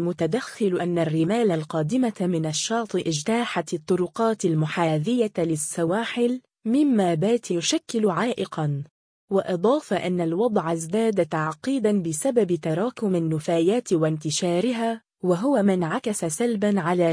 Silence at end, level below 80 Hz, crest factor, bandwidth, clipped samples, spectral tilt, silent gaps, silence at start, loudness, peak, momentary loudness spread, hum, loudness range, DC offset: 0 s; -68 dBFS; 16 dB; 10.5 kHz; under 0.1%; -5.5 dB/octave; 8.91-9.28 s; 0 s; -24 LUFS; -8 dBFS; 4 LU; none; 1 LU; under 0.1%